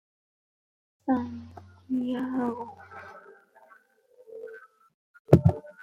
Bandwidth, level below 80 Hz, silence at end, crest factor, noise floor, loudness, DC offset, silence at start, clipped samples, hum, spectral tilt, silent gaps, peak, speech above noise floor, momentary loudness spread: 12.5 kHz; -54 dBFS; 0 s; 28 dB; -60 dBFS; -27 LUFS; under 0.1%; 1.05 s; under 0.1%; none; -9.5 dB/octave; 4.94-5.25 s; -2 dBFS; 31 dB; 27 LU